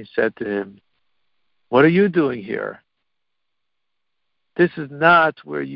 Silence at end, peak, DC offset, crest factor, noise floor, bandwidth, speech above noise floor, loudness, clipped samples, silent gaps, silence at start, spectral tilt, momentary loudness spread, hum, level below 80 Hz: 0 s; -2 dBFS; under 0.1%; 20 dB; -81 dBFS; 5.6 kHz; 63 dB; -18 LUFS; under 0.1%; none; 0 s; -11 dB/octave; 15 LU; none; -62 dBFS